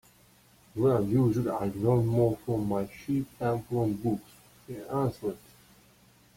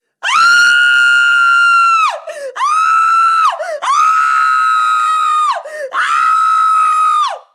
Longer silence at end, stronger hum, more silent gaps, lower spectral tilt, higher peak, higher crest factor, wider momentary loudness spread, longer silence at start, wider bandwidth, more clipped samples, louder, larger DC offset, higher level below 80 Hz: first, 1 s vs 0.15 s; neither; neither; first, -9 dB/octave vs 2.5 dB/octave; second, -12 dBFS vs -2 dBFS; first, 16 dB vs 10 dB; first, 12 LU vs 8 LU; first, 0.75 s vs 0.25 s; first, 16.5 kHz vs 13 kHz; neither; second, -29 LUFS vs -10 LUFS; neither; first, -58 dBFS vs -80 dBFS